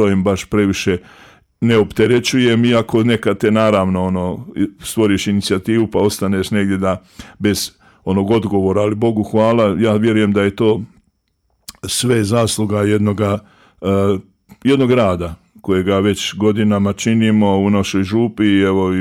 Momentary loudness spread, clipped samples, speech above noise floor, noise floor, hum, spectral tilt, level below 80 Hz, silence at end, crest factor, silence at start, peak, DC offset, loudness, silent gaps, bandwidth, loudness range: 8 LU; under 0.1%; 50 dB; -65 dBFS; none; -6 dB/octave; -46 dBFS; 0 s; 12 dB; 0 s; -2 dBFS; under 0.1%; -16 LUFS; none; 16 kHz; 3 LU